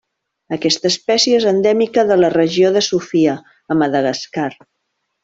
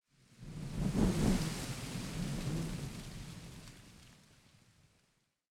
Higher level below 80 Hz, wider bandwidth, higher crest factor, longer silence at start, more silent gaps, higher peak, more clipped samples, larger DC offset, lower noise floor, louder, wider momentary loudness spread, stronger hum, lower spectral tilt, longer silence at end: second, -58 dBFS vs -48 dBFS; second, 7.8 kHz vs 17 kHz; second, 14 dB vs 20 dB; about the same, 0.5 s vs 0.4 s; neither; first, -2 dBFS vs -18 dBFS; neither; neither; second, -72 dBFS vs -77 dBFS; first, -15 LUFS vs -38 LUFS; second, 10 LU vs 22 LU; neither; second, -4 dB/octave vs -5.5 dB/octave; second, 0.7 s vs 1.4 s